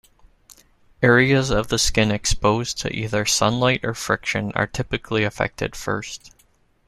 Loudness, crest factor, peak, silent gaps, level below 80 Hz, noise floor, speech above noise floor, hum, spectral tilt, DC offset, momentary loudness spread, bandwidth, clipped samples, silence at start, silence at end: -21 LUFS; 20 dB; -2 dBFS; none; -38 dBFS; -60 dBFS; 39 dB; none; -4 dB/octave; under 0.1%; 10 LU; 15 kHz; under 0.1%; 1 s; 0.6 s